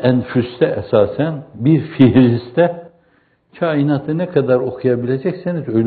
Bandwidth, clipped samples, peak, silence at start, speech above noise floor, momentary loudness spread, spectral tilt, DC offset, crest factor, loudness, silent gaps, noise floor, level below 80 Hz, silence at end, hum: 4.7 kHz; under 0.1%; 0 dBFS; 0 s; 42 dB; 9 LU; -7.5 dB/octave; under 0.1%; 16 dB; -16 LUFS; none; -57 dBFS; -52 dBFS; 0 s; none